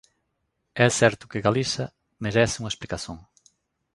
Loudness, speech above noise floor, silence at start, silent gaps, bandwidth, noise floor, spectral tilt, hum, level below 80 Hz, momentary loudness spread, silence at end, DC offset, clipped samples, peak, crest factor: -24 LUFS; 52 dB; 0.75 s; none; 11.5 kHz; -76 dBFS; -4.5 dB/octave; none; -52 dBFS; 17 LU; 0.75 s; under 0.1%; under 0.1%; -2 dBFS; 24 dB